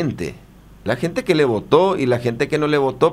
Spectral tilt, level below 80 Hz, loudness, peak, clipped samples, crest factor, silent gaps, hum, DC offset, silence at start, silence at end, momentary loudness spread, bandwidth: -6.5 dB/octave; -48 dBFS; -18 LUFS; 0 dBFS; under 0.1%; 18 dB; none; none; under 0.1%; 0 s; 0 s; 11 LU; 14.5 kHz